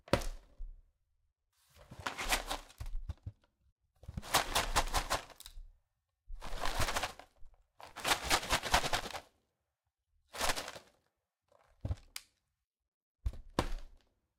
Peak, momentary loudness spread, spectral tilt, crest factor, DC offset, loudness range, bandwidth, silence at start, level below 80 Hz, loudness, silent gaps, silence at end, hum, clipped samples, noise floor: -10 dBFS; 22 LU; -2.5 dB/octave; 30 dB; under 0.1%; 8 LU; 17 kHz; 0.05 s; -46 dBFS; -36 LUFS; 3.72-3.76 s, 12.64-12.71 s, 12.88-13.15 s; 0.4 s; none; under 0.1%; -87 dBFS